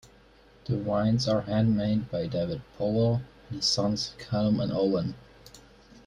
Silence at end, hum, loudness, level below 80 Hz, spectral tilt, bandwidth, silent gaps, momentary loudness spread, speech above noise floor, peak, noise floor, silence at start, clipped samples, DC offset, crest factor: 0.1 s; none; -28 LUFS; -54 dBFS; -6 dB/octave; 11 kHz; none; 8 LU; 30 dB; -12 dBFS; -56 dBFS; 0.05 s; under 0.1%; under 0.1%; 16 dB